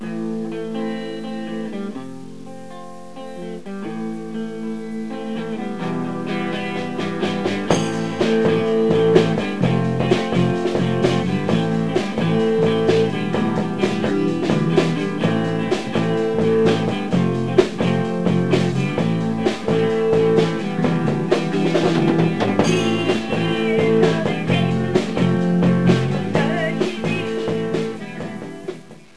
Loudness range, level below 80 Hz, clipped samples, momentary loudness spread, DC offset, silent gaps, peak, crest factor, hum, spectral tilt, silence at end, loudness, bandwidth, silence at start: 11 LU; -50 dBFS; under 0.1%; 12 LU; 1%; none; 0 dBFS; 20 dB; none; -7 dB/octave; 0 s; -20 LUFS; 11 kHz; 0 s